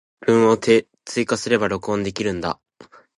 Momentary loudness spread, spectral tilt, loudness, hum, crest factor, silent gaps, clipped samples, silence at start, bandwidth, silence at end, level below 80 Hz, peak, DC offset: 11 LU; -5 dB/octave; -20 LUFS; none; 18 dB; none; under 0.1%; 0.2 s; 11.5 kHz; 0.65 s; -52 dBFS; -2 dBFS; under 0.1%